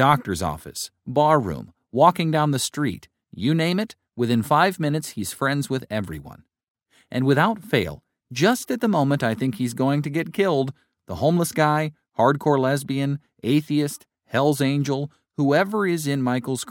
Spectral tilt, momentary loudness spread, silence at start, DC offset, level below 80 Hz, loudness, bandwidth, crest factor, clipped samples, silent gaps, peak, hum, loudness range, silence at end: -5.5 dB/octave; 11 LU; 0 s; under 0.1%; -54 dBFS; -22 LUFS; 17.5 kHz; 20 dB; under 0.1%; 6.70-6.75 s; -2 dBFS; none; 3 LU; 0 s